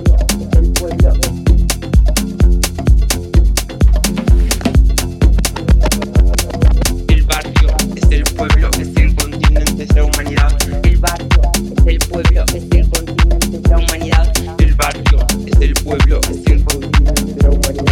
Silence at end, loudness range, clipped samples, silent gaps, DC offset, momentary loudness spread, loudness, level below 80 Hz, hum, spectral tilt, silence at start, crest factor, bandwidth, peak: 0 s; 0 LU; under 0.1%; none; under 0.1%; 2 LU; -14 LUFS; -12 dBFS; none; -4.5 dB/octave; 0 s; 10 dB; 16 kHz; 0 dBFS